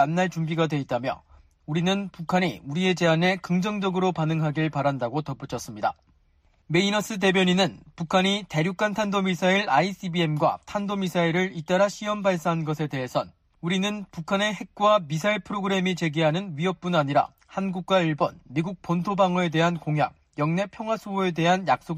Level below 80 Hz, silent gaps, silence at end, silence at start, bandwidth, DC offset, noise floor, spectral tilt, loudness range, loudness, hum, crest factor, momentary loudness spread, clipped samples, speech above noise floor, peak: -60 dBFS; none; 0 s; 0 s; 15 kHz; under 0.1%; -63 dBFS; -5.5 dB/octave; 3 LU; -25 LUFS; none; 16 dB; 8 LU; under 0.1%; 38 dB; -8 dBFS